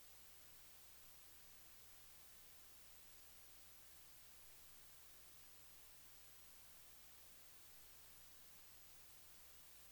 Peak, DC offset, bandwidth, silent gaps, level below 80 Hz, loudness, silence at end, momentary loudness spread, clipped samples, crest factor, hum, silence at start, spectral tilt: -50 dBFS; under 0.1%; over 20 kHz; none; -80 dBFS; -60 LUFS; 0 s; 0 LU; under 0.1%; 14 dB; none; 0 s; -1 dB/octave